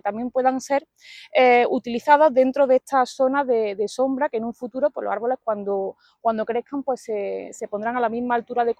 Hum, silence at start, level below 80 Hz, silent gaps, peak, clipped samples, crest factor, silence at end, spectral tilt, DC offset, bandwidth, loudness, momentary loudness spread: none; 0.05 s; -68 dBFS; none; -2 dBFS; under 0.1%; 20 dB; 0.05 s; -4.5 dB/octave; under 0.1%; 12 kHz; -22 LUFS; 11 LU